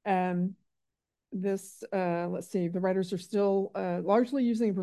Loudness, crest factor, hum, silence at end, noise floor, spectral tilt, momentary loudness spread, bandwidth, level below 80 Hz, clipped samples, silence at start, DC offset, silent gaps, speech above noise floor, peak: -30 LUFS; 18 dB; none; 0 s; -87 dBFS; -7.5 dB/octave; 8 LU; 12.5 kHz; -78 dBFS; under 0.1%; 0.05 s; under 0.1%; none; 58 dB; -12 dBFS